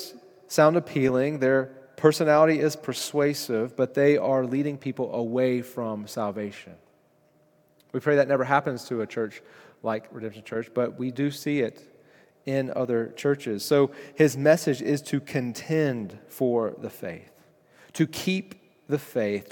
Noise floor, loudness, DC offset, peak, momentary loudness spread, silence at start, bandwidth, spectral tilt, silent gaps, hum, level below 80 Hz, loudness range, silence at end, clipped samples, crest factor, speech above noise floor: -63 dBFS; -25 LUFS; under 0.1%; -4 dBFS; 14 LU; 0 s; 18 kHz; -6 dB/octave; none; none; -72 dBFS; 7 LU; 0.05 s; under 0.1%; 22 dB; 38 dB